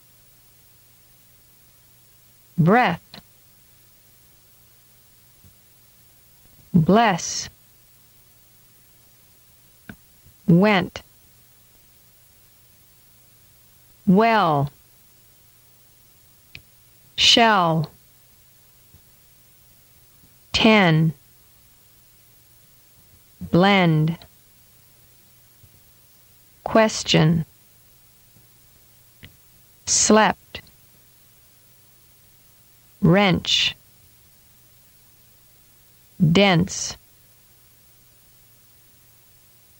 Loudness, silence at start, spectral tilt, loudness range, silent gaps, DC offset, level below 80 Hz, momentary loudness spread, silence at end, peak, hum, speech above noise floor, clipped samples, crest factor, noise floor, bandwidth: -18 LUFS; 2.55 s; -4.5 dB/octave; 4 LU; none; under 0.1%; -54 dBFS; 19 LU; 2.85 s; -2 dBFS; none; 36 dB; under 0.1%; 22 dB; -54 dBFS; 18 kHz